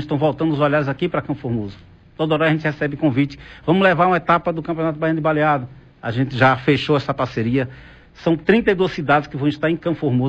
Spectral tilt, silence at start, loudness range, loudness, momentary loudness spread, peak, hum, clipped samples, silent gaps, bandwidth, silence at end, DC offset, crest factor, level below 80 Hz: -8 dB/octave; 0 s; 2 LU; -19 LUFS; 9 LU; -4 dBFS; none; under 0.1%; none; 8.2 kHz; 0 s; under 0.1%; 16 dB; -48 dBFS